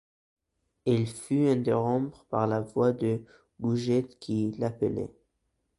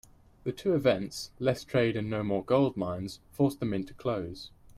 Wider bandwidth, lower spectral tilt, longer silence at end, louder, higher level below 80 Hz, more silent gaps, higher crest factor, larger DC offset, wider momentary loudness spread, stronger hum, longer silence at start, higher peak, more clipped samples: second, 11.5 kHz vs 15.5 kHz; about the same, -7.5 dB/octave vs -6.5 dB/octave; first, 0.7 s vs 0 s; about the same, -29 LUFS vs -30 LUFS; about the same, -62 dBFS vs -58 dBFS; neither; about the same, 18 dB vs 18 dB; neither; second, 8 LU vs 12 LU; neither; first, 0.85 s vs 0.45 s; about the same, -12 dBFS vs -12 dBFS; neither